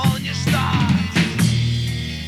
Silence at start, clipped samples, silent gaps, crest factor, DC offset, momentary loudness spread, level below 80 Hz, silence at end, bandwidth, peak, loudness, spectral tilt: 0 s; under 0.1%; none; 14 dB; under 0.1%; 4 LU; -38 dBFS; 0 s; 15 kHz; -4 dBFS; -19 LUFS; -5 dB/octave